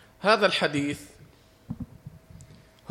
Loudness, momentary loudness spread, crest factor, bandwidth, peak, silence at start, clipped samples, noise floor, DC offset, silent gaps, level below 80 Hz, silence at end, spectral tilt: -24 LUFS; 23 LU; 20 dB; 16 kHz; -8 dBFS; 0.2 s; under 0.1%; -54 dBFS; under 0.1%; none; -58 dBFS; 0.45 s; -4.5 dB/octave